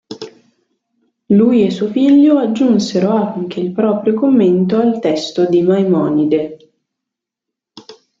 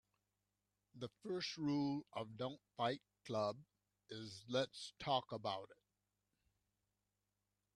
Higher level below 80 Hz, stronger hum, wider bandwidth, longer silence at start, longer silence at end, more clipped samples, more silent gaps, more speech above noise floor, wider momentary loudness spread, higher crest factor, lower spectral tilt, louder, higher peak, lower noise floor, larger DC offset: first, -58 dBFS vs -82 dBFS; second, none vs 50 Hz at -80 dBFS; second, 7.6 kHz vs 11.5 kHz; second, 0.1 s vs 0.95 s; second, 0.3 s vs 2.05 s; neither; neither; first, 69 dB vs 46 dB; about the same, 10 LU vs 12 LU; second, 12 dB vs 22 dB; first, -7.5 dB/octave vs -5.5 dB/octave; first, -13 LUFS vs -44 LUFS; first, -2 dBFS vs -24 dBFS; second, -82 dBFS vs -90 dBFS; neither